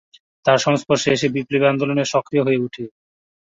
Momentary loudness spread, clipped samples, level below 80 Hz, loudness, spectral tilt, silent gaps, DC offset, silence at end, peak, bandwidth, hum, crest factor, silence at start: 7 LU; under 0.1%; -60 dBFS; -19 LUFS; -5 dB/octave; none; under 0.1%; 0.55 s; -4 dBFS; 7.8 kHz; none; 16 dB; 0.45 s